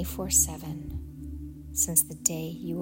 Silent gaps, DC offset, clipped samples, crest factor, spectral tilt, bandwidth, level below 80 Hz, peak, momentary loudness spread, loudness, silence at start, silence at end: none; under 0.1%; under 0.1%; 22 dB; -3.5 dB/octave; 16.5 kHz; -42 dBFS; -8 dBFS; 18 LU; -25 LUFS; 0 s; 0 s